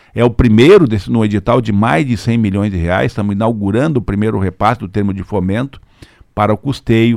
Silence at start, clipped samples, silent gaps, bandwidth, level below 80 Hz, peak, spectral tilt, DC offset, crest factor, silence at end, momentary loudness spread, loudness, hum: 0.15 s; under 0.1%; none; 12.5 kHz; -32 dBFS; 0 dBFS; -7.5 dB/octave; under 0.1%; 12 dB; 0 s; 9 LU; -13 LUFS; none